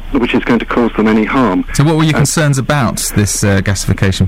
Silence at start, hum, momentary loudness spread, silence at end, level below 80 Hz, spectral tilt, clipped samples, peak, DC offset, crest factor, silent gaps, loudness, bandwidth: 0 s; none; 3 LU; 0 s; -28 dBFS; -5 dB/octave; under 0.1%; 0 dBFS; under 0.1%; 12 dB; none; -12 LUFS; 16.5 kHz